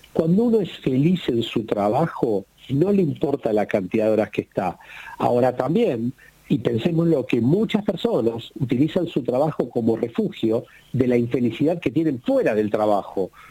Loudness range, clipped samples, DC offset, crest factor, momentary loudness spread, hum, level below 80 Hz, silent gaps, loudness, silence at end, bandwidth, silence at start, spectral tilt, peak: 1 LU; under 0.1%; under 0.1%; 18 dB; 7 LU; none; -56 dBFS; none; -22 LUFS; 0.05 s; 16.5 kHz; 0.15 s; -8 dB/octave; -4 dBFS